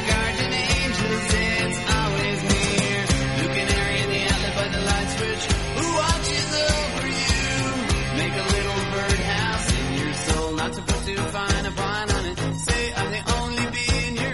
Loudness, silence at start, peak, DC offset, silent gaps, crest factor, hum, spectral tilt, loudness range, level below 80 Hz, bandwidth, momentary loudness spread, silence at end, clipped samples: -23 LUFS; 0 s; -6 dBFS; 0.3%; none; 18 dB; none; -4 dB/octave; 3 LU; -32 dBFS; 11.5 kHz; 4 LU; 0 s; under 0.1%